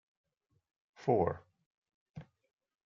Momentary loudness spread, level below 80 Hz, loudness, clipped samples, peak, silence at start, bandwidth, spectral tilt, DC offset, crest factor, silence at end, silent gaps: 23 LU; -70 dBFS; -34 LUFS; under 0.1%; -16 dBFS; 1 s; 7.2 kHz; -8 dB/octave; under 0.1%; 24 dB; 0.65 s; 1.66-1.82 s, 1.94-2.14 s